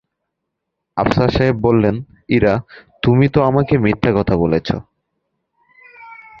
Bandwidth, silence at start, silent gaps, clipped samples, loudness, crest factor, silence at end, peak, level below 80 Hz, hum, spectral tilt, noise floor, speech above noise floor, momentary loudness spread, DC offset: 7.2 kHz; 0.95 s; none; under 0.1%; -16 LUFS; 16 dB; 0.25 s; 0 dBFS; -36 dBFS; none; -8.5 dB/octave; -77 dBFS; 62 dB; 9 LU; under 0.1%